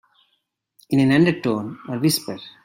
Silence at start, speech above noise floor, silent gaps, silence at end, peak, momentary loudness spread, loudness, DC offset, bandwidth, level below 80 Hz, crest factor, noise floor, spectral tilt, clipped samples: 0.9 s; 51 dB; none; 0.15 s; -4 dBFS; 12 LU; -20 LUFS; under 0.1%; 16.5 kHz; -60 dBFS; 18 dB; -72 dBFS; -5.5 dB/octave; under 0.1%